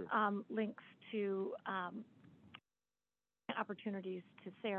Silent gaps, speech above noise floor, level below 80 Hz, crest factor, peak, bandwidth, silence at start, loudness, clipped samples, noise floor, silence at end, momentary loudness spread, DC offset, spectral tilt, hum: none; over 48 dB; -88 dBFS; 20 dB; -24 dBFS; 4.2 kHz; 0 s; -42 LUFS; under 0.1%; under -90 dBFS; 0 s; 22 LU; under 0.1%; -4 dB/octave; 50 Hz at -70 dBFS